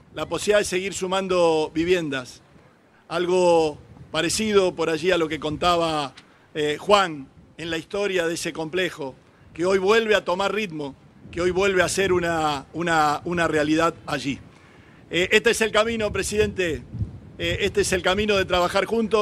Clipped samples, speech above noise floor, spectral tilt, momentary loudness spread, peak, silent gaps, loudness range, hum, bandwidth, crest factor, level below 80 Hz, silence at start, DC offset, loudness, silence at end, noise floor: under 0.1%; 33 dB; -4 dB/octave; 12 LU; -2 dBFS; none; 2 LU; none; 14.5 kHz; 22 dB; -48 dBFS; 0.15 s; under 0.1%; -22 LUFS; 0 s; -55 dBFS